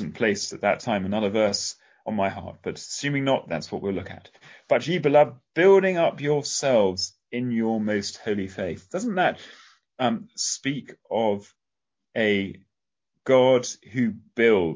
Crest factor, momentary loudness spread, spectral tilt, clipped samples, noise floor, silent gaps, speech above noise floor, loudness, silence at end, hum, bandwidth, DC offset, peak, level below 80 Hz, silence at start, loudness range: 18 dB; 13 LU; -4.5 dB/octave; under 0.1%; -87 dBFS; none; 64 dB; -24 LUFS; 0 s; none; 8 kHz; under 0.1%; -6 dBFS; -58 dBFS; 0 s; 6 LU